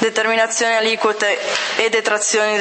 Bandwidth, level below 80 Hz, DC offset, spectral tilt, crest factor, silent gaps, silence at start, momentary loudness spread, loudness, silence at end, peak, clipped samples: 8.8 kHz; -72 dBFS; under 0.1%; -0.5 dB/octave; 18 dB; none; 0 s; 2 LU; -16 LUFS; 0 s; 0 dBFS; under 0.1%